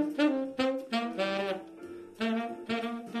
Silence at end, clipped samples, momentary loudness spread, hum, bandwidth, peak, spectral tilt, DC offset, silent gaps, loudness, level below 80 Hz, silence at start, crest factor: 0 s; under 0.1%; 12 LU; none; 13.5 kHz; -14 dBFS; -5 dB/octave; under 0.1%; none; -32 LUFS; -72 dBFS; 0 s; 18 dB